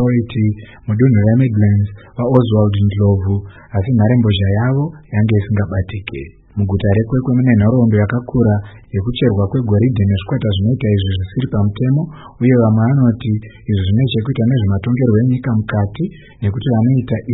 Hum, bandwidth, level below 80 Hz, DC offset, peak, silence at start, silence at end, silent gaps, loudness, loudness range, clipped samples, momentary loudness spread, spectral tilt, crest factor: none; 4 kHz; -40 dBFS; under 0.1%; 0 dBFS; 0 s; 0 s; none; -15 LUFS; 2 LU; under 0.1%; 9 LU; -12 dB/octave; 14 dB